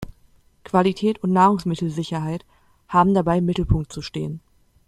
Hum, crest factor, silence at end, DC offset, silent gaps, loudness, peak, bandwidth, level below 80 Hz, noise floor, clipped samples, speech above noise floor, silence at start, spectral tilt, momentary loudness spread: none; 18 dB; 0.5 s; under 0.1%; none; -21 LUFS; -4 dBFS; 11.5 kHz; -38 dBFS; -56 dBFS; under 0.1%; 36 dB; 0 s; -7.5 dB/octave; 13 LU